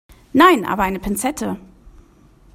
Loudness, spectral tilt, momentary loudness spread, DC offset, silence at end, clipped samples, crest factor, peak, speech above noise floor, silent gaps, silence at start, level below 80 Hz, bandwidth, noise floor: -17 LUFS; -4 dB/octave; 14 LU; under 0.1%; 0.65 s; under 0.1%; 20 dB; 0 dBFS; 33 dB; none; 0.35 s; -42 dBFS; 16 kHz; -50 dBFS